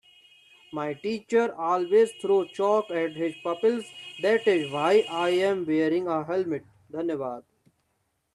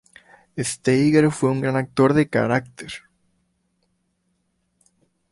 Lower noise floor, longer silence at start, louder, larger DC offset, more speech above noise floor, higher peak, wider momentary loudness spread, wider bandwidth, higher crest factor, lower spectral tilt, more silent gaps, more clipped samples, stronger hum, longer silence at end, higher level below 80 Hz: first, -75 dBFS vs -70 dBFS; first, 0.7 s vs 0.55 s; second, -26 LUFS vs -20 LUFS; neither; about the same, 49 dB vs 51 dB; second, -10 dBFS vs -4 dBFS; second, 11 LU vs 19 LU; about the same, 12 kHz vs 11.5 kHz; about the same, 16 dB vs 20 dB; about the same, -5.5 dB/octave vs -6 dB/octave; neither; neither; neither; second, 0.95 s vs 2.35 s; second, -74 dBFS vs -56 dBFS